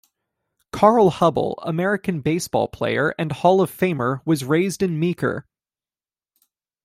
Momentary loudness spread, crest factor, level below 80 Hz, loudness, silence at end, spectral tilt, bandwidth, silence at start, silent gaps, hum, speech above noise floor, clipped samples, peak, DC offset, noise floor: 8 LU; 20 dB; -56 dBFS; -20 LUFS; 1.45 s; -6 dB/octave; 15.5 kHz; 0.75 s; none; none; over 70 dB; under 0.1%; -2 dBFS; under 0.1%; under -90 dBFS